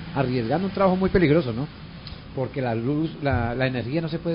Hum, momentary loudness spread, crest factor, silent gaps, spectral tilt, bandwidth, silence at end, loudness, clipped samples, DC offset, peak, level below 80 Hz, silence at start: none; 15 LU; 18 dB; none; -12 dB/octave; 5.4 kHz; 0 s; -24 LUFS; under 0.1%; under 0.1%; -6 dBFS; -42 dBFS; 0 s